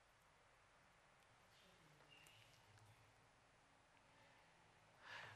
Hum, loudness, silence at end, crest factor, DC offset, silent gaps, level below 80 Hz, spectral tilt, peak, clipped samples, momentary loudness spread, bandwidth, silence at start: none; -64 LUFS; 0 s; 22 dB; under 0.1%; none; -86 dBFS; -3 dB/octave; -46 dBFS; under 0.1%; 11 LU; 13 kHz; 0 s